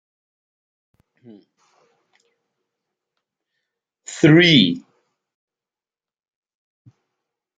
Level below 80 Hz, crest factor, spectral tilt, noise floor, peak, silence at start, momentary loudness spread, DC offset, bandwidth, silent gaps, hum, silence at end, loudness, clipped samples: -62 dBFS; 22 dB; -5.5 dB/octave; under -90 dBFS; 0 dBFS; 4.1 s; 21 LU; under 0.1%; 9.2 kHz; none; none; 2.8 s; -13 LUFS; under 0.1%